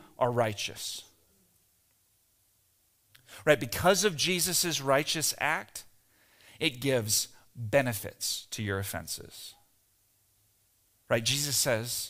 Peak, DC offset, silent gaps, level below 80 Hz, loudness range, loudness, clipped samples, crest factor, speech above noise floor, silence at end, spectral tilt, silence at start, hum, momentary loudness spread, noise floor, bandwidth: -8 dBFS; under 0.1%; none; -62 dBFS; 8 LU; -29 LUFS; under 0.1%; 24 dB; 40 dB; 0 s; -3 dB/octave; 0 s; none; 13 LU; -70 dBFS; 16 kHz